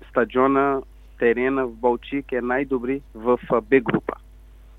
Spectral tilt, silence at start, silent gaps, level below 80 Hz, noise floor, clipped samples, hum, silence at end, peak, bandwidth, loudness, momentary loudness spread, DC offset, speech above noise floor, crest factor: -8.5 dB/octave; 0.15 s; none; -46 dBFS; -46 dBFS; under 0.1%; none; 0.65 s; -4 dBFS; 4 kHz; -22 LUFS; 8 LU; under 0.1%; 24 dB; 18 dB